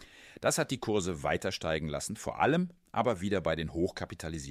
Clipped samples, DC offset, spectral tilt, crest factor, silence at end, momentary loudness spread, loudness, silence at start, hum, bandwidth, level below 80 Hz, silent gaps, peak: under 0.1%; under 0.1%; -4.5 dB/octave; 20 dB; 0 s; 8 LU; -32 LUFS; 0 s; none; 15.5 kHz; -54 dBFS; none; -12 dBFS